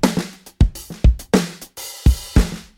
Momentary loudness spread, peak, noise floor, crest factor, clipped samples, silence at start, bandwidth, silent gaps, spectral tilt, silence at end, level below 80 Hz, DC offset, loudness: 14 LU; -2 dBFS; -35 dBFS; 16 dB; under 0.1%; 0.05 s; 17 kHz; none; -6 dB/octave; 0.2 s; -20 dBFS; under 0.1%; -20 LUFS